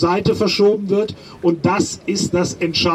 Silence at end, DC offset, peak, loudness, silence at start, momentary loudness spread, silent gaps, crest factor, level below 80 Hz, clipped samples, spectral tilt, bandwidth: 0 s; under 0.1%; -2 dBFS; -18 LUFS; 0 s; 6 LU; none; 14 dB; -48 dBFS; under 0.1%; -5 dB/octave; 13.5 kHz